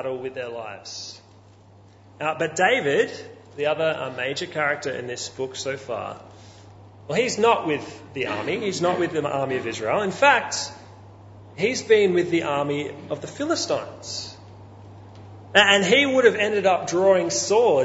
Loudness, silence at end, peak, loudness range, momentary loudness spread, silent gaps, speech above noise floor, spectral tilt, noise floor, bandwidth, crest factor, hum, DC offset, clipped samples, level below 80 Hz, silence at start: -22 LUFS; 0 s; 0 dBFS; 7 LU; 15 LU; none; 28 dB; -3.5 dB/octave; -50 dBFS; 8 kHz; 22 dB; none; under 0.1%; under 0.1%; -64 dBFS; 0 s